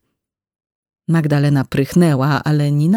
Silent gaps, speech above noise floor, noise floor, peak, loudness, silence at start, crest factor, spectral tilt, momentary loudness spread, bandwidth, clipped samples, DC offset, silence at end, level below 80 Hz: none; 62 dB; -76 dBFS; -2 dBFS; -16 LUFS; 1.1 s; 14 dB; -7.5 dB/octave; 4 LU; 15.5 kHz; under 0.1%; under 0.1%; 0 s; -50 dBFS